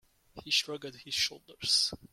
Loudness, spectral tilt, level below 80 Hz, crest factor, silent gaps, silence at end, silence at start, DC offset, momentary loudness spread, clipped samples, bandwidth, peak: -30 LUFS; -0.5 dB/octave; -66 dBFS; 20 dB; none; 0.05 s; 0.35 s; under 0.1%; 14 LU; under 0.1%; 16.5 kHz; -14 dBFS